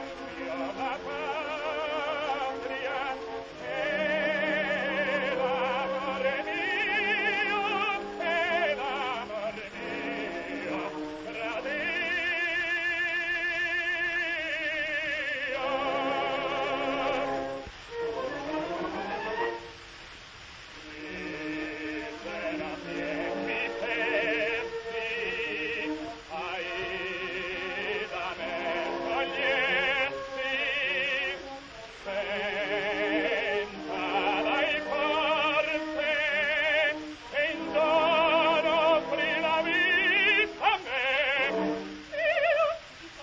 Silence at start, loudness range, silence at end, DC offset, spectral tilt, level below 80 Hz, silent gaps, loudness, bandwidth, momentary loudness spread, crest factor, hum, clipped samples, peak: 0 s; 8 LU; 0 s; under 0.1%; -4 dB/octave; -60 dBFS; none; -29 LUFS; 8 kHz; 11 LU; 18 dB; none; under 0.1%; -12 dBFS